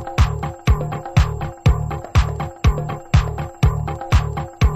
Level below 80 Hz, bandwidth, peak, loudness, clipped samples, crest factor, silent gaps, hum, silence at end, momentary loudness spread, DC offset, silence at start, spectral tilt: -22 dBFS; 13 kHz; -2 dBFS; -20 LUFS; under 0.1%; 16 dB; none; none; 0 s; 5 LU; under 0.1%; 0 s; -6.5 dB/octave